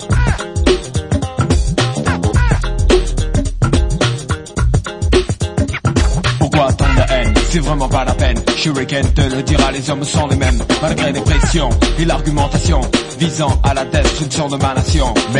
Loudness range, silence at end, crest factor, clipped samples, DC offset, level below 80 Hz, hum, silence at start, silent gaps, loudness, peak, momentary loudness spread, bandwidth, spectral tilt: 1 LU; 0 s; 14 dB; under 0.1%; 0.2%; -18 dBFS; none; 0 s; none; -15 LUFS; 0 dBFS; 4 LU; 11 kHz; -5 dB/octave